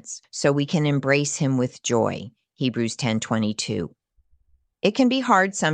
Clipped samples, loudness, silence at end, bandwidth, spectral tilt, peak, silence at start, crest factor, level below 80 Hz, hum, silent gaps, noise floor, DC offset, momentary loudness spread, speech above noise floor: under 0.1%; -22 LUFS; 0 s; 10 kHz; -5 dB/octave; -4 dBFS; 0.05 s; 20 dB; -60 dBFS; none; none; -63 dBFS; under 0.1%; 10 LU; 41 dB